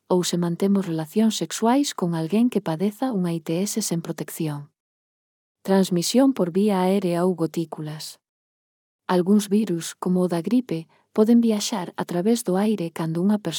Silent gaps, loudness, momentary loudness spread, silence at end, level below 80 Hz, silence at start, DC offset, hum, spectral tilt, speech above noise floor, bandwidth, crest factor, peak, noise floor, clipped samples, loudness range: 4.80-5.55 s, 8.29-8.99 s; -23 LUFS; 10 LU; 0 s; -78 dBFS; 0.1 s; under 0.1%; none; -5.5 dB/octave; over 68 dB; 19 kHz; 18 dB; -6 dBFS; under -90 dBFS; under 0.1%; 3 LU